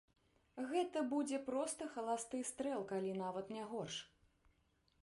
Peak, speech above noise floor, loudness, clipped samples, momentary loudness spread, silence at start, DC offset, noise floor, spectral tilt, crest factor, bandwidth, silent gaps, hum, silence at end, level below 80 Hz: -26 dBFS; 36 dB; -42 LUFS; under 0.1%; 8 LU; 0.55 s; under 0.1%; -78 dBFS; -4 dB/octave; 16 dB; 11.5 kHz; none; none; 0.95 s; -80 dBFS